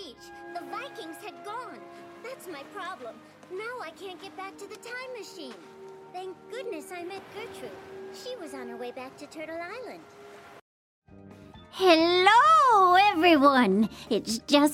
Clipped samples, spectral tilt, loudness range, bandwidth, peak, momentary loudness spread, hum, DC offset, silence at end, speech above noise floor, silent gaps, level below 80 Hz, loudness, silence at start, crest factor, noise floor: under 0.1%; -4 dB/octave; 19 LU; 16 kHz; -8 dBFS; 24 LU; none; under 0.1%; 0 s; 22 dB; 10.61-11.02 s; -68 dBFS; -22 LUFS; 0 s; 20 dB; -49 dBFS